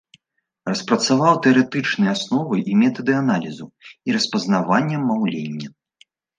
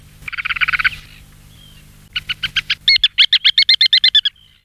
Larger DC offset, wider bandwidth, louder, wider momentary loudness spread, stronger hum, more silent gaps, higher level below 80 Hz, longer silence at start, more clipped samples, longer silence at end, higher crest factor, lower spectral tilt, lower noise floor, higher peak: neither; second, 9.6 kHz vs 16 kHz; second, -19 LUFS vs -12 LUFS; about the same, 16 LU vs 15 LU; second, none vs 50 Hz at -50 dBFS; neither; second, -68 dBFS vs -46 dBFS; first, 0.65 s vs 0.25 s; neither; first, 0.7 s vs 0.35 s; about the same, 18 dB vs 14 dB; first, -5 dB/octave vs 0.5 dB/octave; first, -75 dBFS vs -43 dBFS; about the same, -2 dBFS vs -2 dBFS